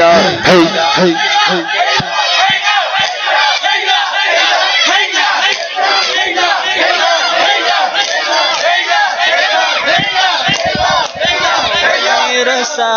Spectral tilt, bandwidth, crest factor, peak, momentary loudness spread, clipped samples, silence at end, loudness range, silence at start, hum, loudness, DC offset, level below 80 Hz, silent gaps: -2 dB/octave; 7.8 kHz; 12 dB; 0 dBFS; 3 LU; under 0.1%; 0 s; 1 LU; 0 s; none; -10 LUFS; under 0.1%; -48 dBFS; none